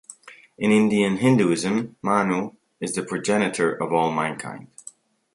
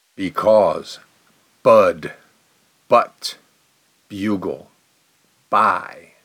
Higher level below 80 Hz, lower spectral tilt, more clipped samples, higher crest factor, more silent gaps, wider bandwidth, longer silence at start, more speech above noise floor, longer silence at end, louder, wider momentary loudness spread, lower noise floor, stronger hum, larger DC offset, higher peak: about the same, -64 dBFS vs -64 dBFS; about the same, -5.5 dB/octave vs -5 dB/octave; neither; about the same, 18 dB vs 18 dB; neither; second, 11.5 kHz vs 15.5 kHz; about the same, 0.1 s vs 0.2 s; second, 26 dB vs 43 dB; first, 0.7 s vs 0.3 s; second, -22 LUFS vs -18 LUFS; second, 17 LU vs 21 LU; second, -48 dBFS vs -61 dBFS; neither; neither; about the same, -4 dBFS vs -2 dBFS